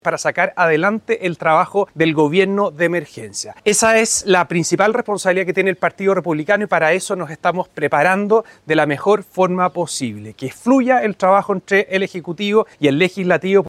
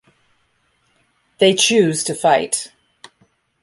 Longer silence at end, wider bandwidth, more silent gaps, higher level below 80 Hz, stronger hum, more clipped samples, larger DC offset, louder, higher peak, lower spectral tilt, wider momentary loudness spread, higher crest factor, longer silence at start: second, 0 s vs 0.95 s; first, 15 kHz vs 11.5 kHz; neither; first, -60 dBFS vs -66 dBFS; neither; neither; neither; about the same, -17 LUFS vs -16 LUFS; about the same, -2 dBFS vs -2 dBFS; first, -4.5 dB/octave vs -3 dB/octave; second, 7 LU vs 10 LU; about the same, 14 dB vs 18 dB; second, 0.05 s vs 1.4 s